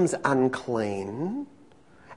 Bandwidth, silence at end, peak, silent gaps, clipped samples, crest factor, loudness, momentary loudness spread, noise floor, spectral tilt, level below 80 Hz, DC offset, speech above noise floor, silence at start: 11 kHz; 0 s; -8 dBFS; none; under 0.1%; 20 dB; -28 LUFS; 11 LU; -55 dBFS; -6 dB/octave; -66 dBFS; 0.1%; 28 dB; 0 s